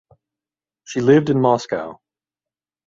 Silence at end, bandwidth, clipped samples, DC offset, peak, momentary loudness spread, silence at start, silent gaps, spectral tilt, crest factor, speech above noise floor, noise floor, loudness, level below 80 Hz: 0.95 s; 7.8 kHz; under 0.1%; under 0.1%; -2 dBFS; 13 LU; 0.9 s; none; -7 dB/octave; 20 dB; over 73 dB; under -90 dBFS; -18 LUFS; -60 dBFS